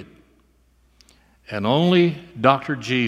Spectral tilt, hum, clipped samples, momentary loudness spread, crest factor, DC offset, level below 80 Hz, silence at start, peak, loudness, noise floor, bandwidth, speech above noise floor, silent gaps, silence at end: -6.5 dB/octave; none; under 0.1%; 8 LU; 22 dB; under 0.1%; -58 dBFS; 0 s; 0 dBFS; -19 LUFS; -59 dBFS; 9.8 kHz; 40 dB; none; 0 s